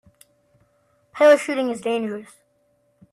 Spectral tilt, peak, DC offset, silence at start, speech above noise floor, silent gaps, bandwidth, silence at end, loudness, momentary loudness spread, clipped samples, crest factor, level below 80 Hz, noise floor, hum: -4 dB/octave; -4 dBFS; under 0.1%; 1.15 s; 46 dB; none; 12.5 kHz; 0.9 s; -19 LUFS; 19 LU; under 0.1%; 20 dB; -72 dBFS; -65 dBFS; none